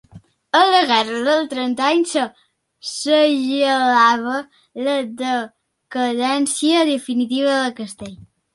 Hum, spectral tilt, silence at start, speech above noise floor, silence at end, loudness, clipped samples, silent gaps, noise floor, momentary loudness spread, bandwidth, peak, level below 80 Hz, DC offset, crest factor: none; -2.5 dB/octave; 0.15 s; 24 dB; 0.35 s; -18 LUFS; under 0.1%; none; -42 dBFS; 15 LU; 11.5 kHz; -2 dBFS; -64 dBFS; under 0.1%; 16 dB